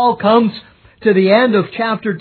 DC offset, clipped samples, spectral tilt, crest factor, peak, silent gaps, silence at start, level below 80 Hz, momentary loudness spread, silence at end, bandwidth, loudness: under 0.1%; under 0.1%; -9.5 dB/octave; 14 dB; 0 dBFS; none; 0 s; -58 dBFS; 8 LU; 0 s; 4.6 kHz; -14 LUFS